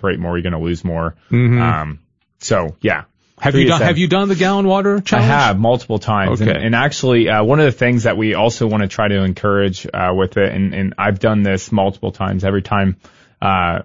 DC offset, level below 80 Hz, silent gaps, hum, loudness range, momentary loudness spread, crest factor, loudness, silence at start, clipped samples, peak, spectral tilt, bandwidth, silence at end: 0.5%; -40 dBFS; none; none; 3 LU; 8 LU; 14 dB; -16 LUFS; 0 s; under 0.1%; 0 dBFS; -6 dB/octave; 7.8 kHz; 0 s